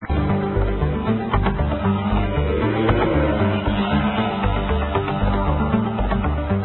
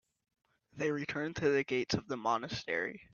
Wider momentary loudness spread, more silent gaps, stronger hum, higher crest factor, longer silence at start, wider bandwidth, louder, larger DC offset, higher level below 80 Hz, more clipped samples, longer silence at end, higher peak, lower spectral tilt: about the same, 3 LU vs 5 LU; neither; neither; about the same, 16 dB vs 18 dB; second, 0 s vs 0.75 s; second, 4.2 kHz vs 7.2 kHz; first, -21 LUFS vs -35 LUFS; neither; first, -26 dBFS vs -66 dBFS; neither; about the same, 0 s vs 0.1 s; first, -4 dBFS vs -18 dBFS; first, -12.5 dB/octave vs -3.5 dB/octave